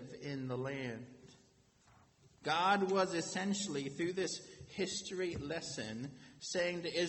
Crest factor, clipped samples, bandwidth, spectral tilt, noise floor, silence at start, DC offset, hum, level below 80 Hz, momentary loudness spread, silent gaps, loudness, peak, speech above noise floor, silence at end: 20 dB; under 0.1%; 8.6 kHz; -4 dB/octave; -69 dBFS; 0 s; under 0.1%; none; -70 dBFS; 14 LU; none; -38 LUFS; -20 dBFS; 31 dB; 0 s